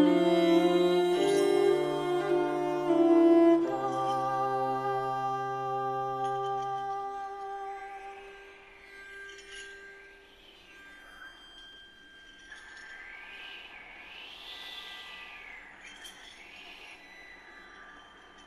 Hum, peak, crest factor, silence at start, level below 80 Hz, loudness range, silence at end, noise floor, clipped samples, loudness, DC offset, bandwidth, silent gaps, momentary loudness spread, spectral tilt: none; -14 dBFS; 18 dB; 0 s; -68 dBFS; 22 LU; 0.45 s; -55 dBFS; under 0.1%; -28 LUFS; under 0.1%; 13 kHz; none; 25 LU; -5.5 dB/octave